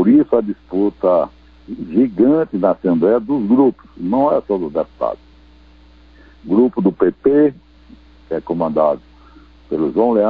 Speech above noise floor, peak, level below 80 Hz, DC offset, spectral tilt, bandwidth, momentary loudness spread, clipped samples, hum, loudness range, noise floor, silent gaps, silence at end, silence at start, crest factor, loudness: 30 dB; -2 dBFS; -48 dBFS; 0.1%; -11 dB/octave; 4.9 kHz; 12 LU; under 0.1%; none; 3 LU; -46 dBFS; none; 0 s; 0 s; 14 dB; -17 LUFS